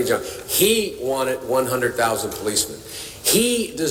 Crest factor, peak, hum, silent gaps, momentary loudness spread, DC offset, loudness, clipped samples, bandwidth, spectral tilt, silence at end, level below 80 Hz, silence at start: 18 dB; -4 dBFS; none; none; 7 LU; under 0.1%; -20 LUFS; under 0.1%; 18 kHz; -2.5 dB/octave; 0 s; -50 dBFS; 0 s